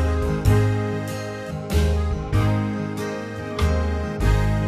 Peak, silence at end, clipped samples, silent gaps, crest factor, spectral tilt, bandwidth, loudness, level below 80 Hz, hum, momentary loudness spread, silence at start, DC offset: -6 dBFS; 0 s; under 0.1%; none; 16 dB; -7 dB/octave; 14 kHz; -23 LUFS; -26 dBFS; none; 10 LU; 0 s; under 0.1%